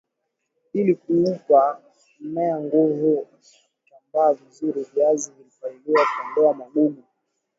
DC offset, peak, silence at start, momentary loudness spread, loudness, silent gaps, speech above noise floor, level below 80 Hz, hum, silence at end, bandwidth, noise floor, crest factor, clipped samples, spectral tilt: under 0.1%; -4 dBFS; 0.75 s; 16 LU; -21 LUFS; none; 57 dB; -72 dBFS; none; 0.65 s; 7.8 kHz; -78 dBFS; 18 dB; under 0.1%; -6 dB/octave